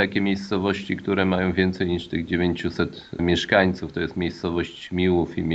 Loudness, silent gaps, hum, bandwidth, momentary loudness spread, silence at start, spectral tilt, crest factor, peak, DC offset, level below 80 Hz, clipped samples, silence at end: -24 LUFS; none; none; 8 kHz; 8 LU; 0 s; -6.5 dB/octave; 20 dB; -2 dBFS; under 0.1%; -46 dBFS; under 0.1%; 0 s